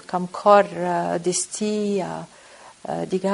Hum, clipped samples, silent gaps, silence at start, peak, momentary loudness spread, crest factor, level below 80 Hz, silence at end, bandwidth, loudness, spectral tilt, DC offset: none; under 0.1%; none; 0.1 s; -2 dBFS; 17 LU; 20 dB; -66 dBFS; 0 s; 11 kHz; -22 LUFS; -4.5 dB/octave; under 0.1%